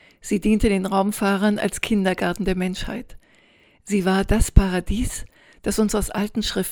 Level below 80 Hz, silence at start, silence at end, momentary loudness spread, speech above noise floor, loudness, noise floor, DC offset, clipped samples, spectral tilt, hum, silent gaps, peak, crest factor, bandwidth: -28 dBFS; 0.25 s; 0 s; 8 LU; 35 dB; -22 LUFS; -56 dBFS; under 0.1%; under 0.1%; -5.5 dB/octave; none; none; 0 dBFS; 22 dB; 20 kHz